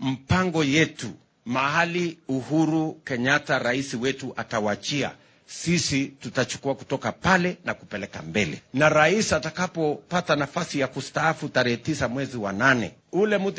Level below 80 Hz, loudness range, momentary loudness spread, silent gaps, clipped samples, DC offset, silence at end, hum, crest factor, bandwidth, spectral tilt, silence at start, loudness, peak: -52 dBFS; 3 LU; 9 LU; none; under 0.1%; under 0.1%; 0 s; none; 20 dB; 8 kHz; -4.5 dB/octave; 0 s; -24 LUFS; -6 dBFS